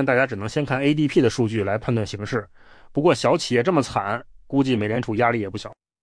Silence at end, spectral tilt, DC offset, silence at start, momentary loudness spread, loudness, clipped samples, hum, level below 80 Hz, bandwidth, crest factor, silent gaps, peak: 0.3 s; -6 dB/octave; under 0.1%; 0 s; 9 LU; -22 LUFS; under 0.1%; none; -52 dBFS; 10.5 kHz; 16 dB; none; -6 dBFS